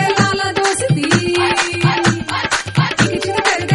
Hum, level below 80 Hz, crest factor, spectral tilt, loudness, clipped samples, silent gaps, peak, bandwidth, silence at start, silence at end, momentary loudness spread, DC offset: none; -44 dBFS; 16 dB; -4 dB/octave; -15 LUFS; under 0.1%; none; 0 dBFS; 11.5 kHz; 0 s; 0 s; 3 LU; under 0.1%